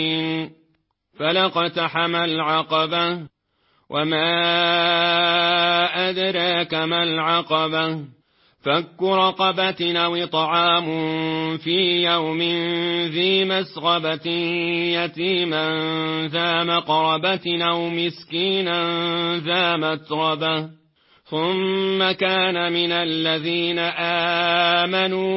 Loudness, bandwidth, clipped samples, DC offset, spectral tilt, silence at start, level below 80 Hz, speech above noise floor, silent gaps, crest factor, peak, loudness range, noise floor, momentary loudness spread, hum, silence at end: -20 LUFS; 5.8 kHz; under 0.1%; under 0.1%; -9 dB/octave; 0 s; -64 dBFS; 46 dB; none; 16 dB; -6 dBFS; 3 LU; -67 dBFS; 6 LU; none; 0 s